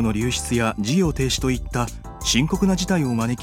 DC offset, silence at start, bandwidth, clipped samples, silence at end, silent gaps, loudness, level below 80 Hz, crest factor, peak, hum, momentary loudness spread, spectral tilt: under 0.1%; 0 s; 16.5 kHz; under 0.1%; 0 s; none; -22 LUFS; -34 dBFS; 18 dB; -4 dBFS; none; 7 LU; -4.5 dB/octave